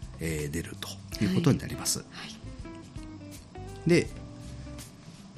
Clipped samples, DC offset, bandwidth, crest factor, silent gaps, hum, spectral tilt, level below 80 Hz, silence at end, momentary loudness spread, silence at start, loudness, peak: under 0.1%; under 0.1%; 14 kHz; 20 dB; none; none; -5 dB/octave; -48 dBFS; 0 s; 18 LU; 0 s; -30 LUFS; -12 dBFS